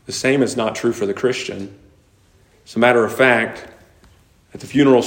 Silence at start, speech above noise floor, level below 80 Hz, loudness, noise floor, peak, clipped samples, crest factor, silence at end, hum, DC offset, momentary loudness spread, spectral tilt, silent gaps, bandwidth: 0.1 s; 37 dB; -56 dBFS; -17 LUFS; -54 dBFS; 0 dBFS; under 0.1%; 18 dB; 0 s; none; under 0.1%; 17 LU; -4.5 dB/octave; none; 16.5 kHz